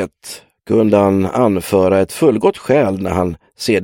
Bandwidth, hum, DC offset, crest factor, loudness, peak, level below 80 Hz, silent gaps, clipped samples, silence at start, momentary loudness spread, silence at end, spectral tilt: 17 kHz; none; under 0.1%; 14 dB; -15 LUFS; 0 dBFS; -46 dBFS; none; under 0.1%; 0 s; 12 LU; 0 s; -6.5 dB/octave